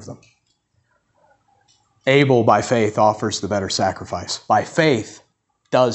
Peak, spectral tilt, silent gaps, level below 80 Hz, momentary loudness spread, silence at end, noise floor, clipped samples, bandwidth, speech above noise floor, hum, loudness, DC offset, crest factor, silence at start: -2 dBFS; -5 dB/octave; none; -58 dBFS; 12 LU; 0 s; -66 dBFS; under 0.1%; 8.4 kHz; 48 dB; none; -18 LUFS; under 0.1%; 18 dB; 0 s